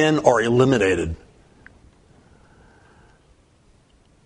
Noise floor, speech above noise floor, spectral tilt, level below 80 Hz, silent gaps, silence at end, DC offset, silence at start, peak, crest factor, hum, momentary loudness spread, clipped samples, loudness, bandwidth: -56 dBFS; 39 dB; -6 dB/octave; -46 dBFS; none; 3.1 s; under 0.1%; 0 s; 0 dBFS; 22 dB; none; 13 LU; under 0.1%; -18 LUFS; 10.5 kHz